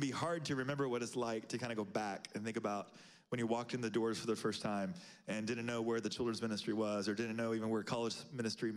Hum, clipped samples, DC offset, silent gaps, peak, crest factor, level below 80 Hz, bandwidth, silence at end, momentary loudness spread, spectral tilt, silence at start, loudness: none; under 0.1%; under 0.1%; none; -26 dBFS; 14 dB; -78 dBFS; 14 kHz; 0 s; 5 LU; -5 dB/octave; 0 s; -40 LUFS